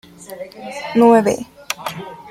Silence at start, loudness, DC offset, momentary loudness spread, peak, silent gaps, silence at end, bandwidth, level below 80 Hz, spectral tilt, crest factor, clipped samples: 0.2 s; -16 LUFS; under 0.1%; 21 LU; -2 dBFS; none; 0 s; 16 kHz; -56 dBFS; -5 dB/octave; 16 dB; under 0.1%